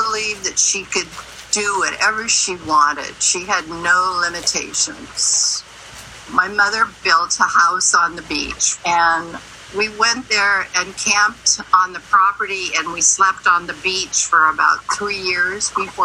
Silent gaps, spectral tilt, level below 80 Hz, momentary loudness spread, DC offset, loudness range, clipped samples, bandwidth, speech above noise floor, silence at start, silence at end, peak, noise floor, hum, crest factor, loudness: none; 0 dB/octave; -50 dBFS; 8 LU; under 0.1%; 2 LU; under 0.1%; 15 kHz; 20 dB; 0 s; 0 s; 0 dBFS; -37 dBFS; none; 18 dB; -16 LUFS